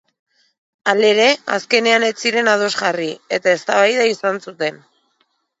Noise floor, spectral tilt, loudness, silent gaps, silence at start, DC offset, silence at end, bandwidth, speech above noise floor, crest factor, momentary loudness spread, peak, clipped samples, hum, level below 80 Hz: -66 dBFS; -2.5 dB/octave; -16 LUFS; none; 0.85 s; under 0.1%; 0.85 s; 8 kHz; 49 dB; 18 dB; 10 LU; 0 dBFS; under 0.1%; none; -74 dBFS